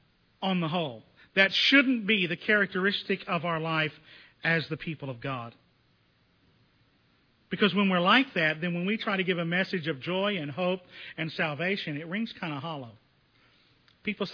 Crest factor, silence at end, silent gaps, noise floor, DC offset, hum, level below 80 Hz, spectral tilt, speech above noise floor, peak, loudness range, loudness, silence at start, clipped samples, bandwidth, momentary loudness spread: 24 dB; 0 s; none; -67 dBFS; under 0.1%; none; -72 dBFS; -6 dB/octave; 39 dB; -6 dBFS; 9 LU; -27 LUFS; 0.4 s; under 0.1%; 5.4 kHz; 14 LU